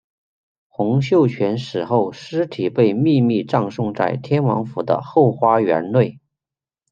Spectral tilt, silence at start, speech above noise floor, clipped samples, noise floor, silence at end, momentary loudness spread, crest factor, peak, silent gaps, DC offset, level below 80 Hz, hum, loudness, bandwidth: -8.5 dB/octave; 0.8 s; 72 dB; under 0.1%; -90 dBFS; 0.8 s; 8 LU; 16 dB; -2 dBFS; none; under 0.1%; -62 dBFS; none; -19 LUFS; 7.4 kHz